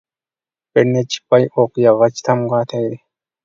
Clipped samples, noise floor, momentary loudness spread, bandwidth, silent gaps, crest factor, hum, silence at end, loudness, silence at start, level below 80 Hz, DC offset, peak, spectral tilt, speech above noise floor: under 0.1%; under -90 dBFS; 9 LU; 7.6 kHz; none; 16 dB; none; 0.5 s; -16 LUFS; 0.75 s; -62 dBFS; under 0.1%; 0 dBFS; -6 dB/octave; over 75 dB